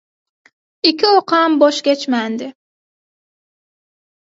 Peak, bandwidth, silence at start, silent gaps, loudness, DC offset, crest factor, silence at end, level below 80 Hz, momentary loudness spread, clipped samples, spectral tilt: 0 dBFS; 8 kHz; 0.85 s; none; -14 LUFS; under 0.1%; 18 dB; 1.8 s; -72 dBFS; 12 LU; under 0.1%; -3 dB/octave